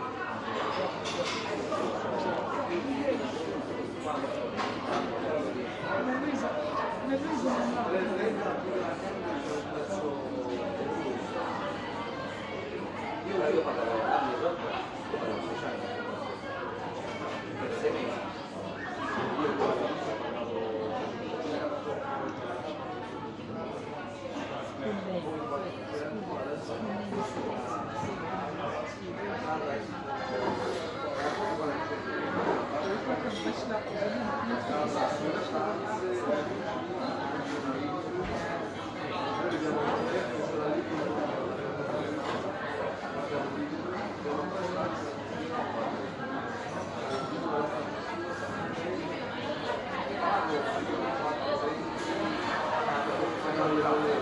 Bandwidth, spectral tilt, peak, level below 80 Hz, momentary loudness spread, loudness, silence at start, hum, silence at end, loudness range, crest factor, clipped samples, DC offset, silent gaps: 11.5 kHz; -5.5 dB/octave; -14 dBFS; -62 dBFS; 7 LU; -33 LUFS; 0 s; none; 0 s; 4 LU; 18 dB; under 0.1%; under 0.1%; none